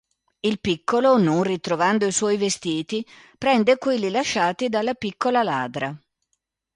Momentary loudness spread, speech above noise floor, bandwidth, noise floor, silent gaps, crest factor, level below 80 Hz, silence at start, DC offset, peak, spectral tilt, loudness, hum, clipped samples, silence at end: 9 LU; 54 dB; 11.5 kHz; -76 dBFS; none; 16 dB; -60 dBFS; 0.45 s; under 0.1%; -6 dBFS; -4.5 dB/octave; -22 LUFS; none; under 0.1%; 0.8 s